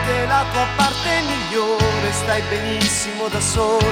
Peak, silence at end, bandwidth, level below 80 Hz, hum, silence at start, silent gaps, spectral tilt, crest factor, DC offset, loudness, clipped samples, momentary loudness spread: -4 dBFS; 0 s; 18 kHz; -34 dBFS; none; 0 s; none; -3.5 dB/octave; 16 dB; under 0.1%; -19 LUFS; under 0.1%; 3 LU